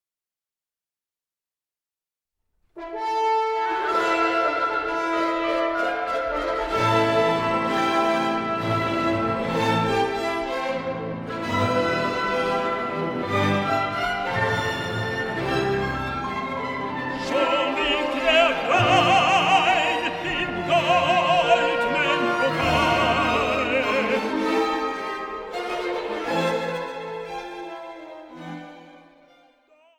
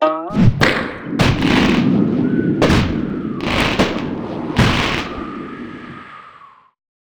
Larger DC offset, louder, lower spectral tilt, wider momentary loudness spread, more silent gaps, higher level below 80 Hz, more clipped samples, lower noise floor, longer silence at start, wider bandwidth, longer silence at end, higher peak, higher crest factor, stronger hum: neither; second, -22 LUFS vs -17 LUFS; about the same, -5 dB/octave vs -6 dB/octave; second, 12 LU vs 16 LU; neither; second, -50 dBFS vs -32 dBFS; neither; first, under -90 dBFS vs -44 dBFS; first, 2.75 s vs 0 s; second, 17.5 kHz vs over 20 kHz; first, 1 s vs 0.65 s; second, -6 dBFS vs 0 dBFS; about the same, 18 dB vs 16 dB; neither